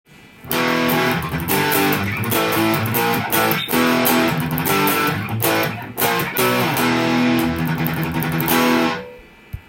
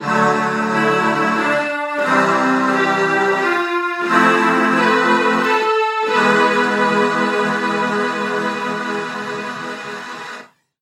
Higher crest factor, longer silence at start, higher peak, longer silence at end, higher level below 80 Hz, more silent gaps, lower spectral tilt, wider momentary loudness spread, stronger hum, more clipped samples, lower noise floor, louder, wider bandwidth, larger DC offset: about the same, 18 dB vs 16 dB; first, 0.25 s vs 0 s; about the same, -2 dBFS vs 0 dBFS; second, 0.1 s vs 0.35 s; first, -46 dBFS vs -68 dBFS; neither; about the same, -4.5 dB/octave vs -4.5 dB/octave; second, 5 LU vs 11 LU; neither; neither; about the same, -40 dBFS vs -38 dBFS; about the same, -18 LUFS vs -16 LUFS; about the same, 17 kHz vs 15.5 kHz; neither